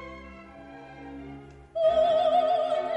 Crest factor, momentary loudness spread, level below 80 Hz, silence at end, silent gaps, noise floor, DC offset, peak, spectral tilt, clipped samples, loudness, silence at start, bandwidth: 14 dB; 23 LU; -56 dBFS; 0 s; none; -46 dBFS; under 0.1%; -14 dBFS; -5.5 dB/octave; under 0.1%; -24 LUFS; 0 s; 8.6 kHz